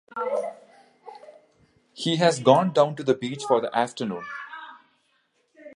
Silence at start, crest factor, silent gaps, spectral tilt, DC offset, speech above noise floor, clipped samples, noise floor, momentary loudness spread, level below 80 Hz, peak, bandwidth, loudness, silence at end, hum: 0.15 s; 24 dB; none; -5 dB/octave; under 0.1%; 46 dB; under 0.1%; -69 dBFS; 21 LU; -76 dBFS; -2 dBFS; 11.5 kHz; -23 LUFS; 0.05 s; none